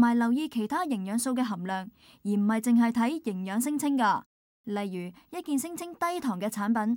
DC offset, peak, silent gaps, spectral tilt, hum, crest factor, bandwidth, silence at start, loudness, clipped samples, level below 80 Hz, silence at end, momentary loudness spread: under 0.1%; -12 dBFS; 4.26-4.64 s; -5 dB/octave; none; 16 dB; 17.5 kHz; 0 s; -29 LUFS; under 0.1%; -74 dBFS; 0 s; 12 LU